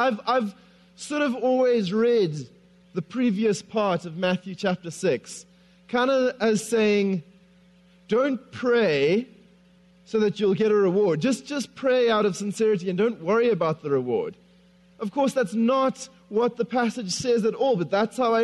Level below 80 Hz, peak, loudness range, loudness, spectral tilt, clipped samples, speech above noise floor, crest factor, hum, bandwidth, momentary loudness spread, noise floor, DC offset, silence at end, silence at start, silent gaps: -68 dBFS; -10 dBFS; 3 LU; -24 LUFS; -5.5 dB/octave; under 0.1%; 33 dB; 14 dB; none; 12 kHz; 10 LU; -56 dBFS; under 0.1%; 0 s; 0 s; none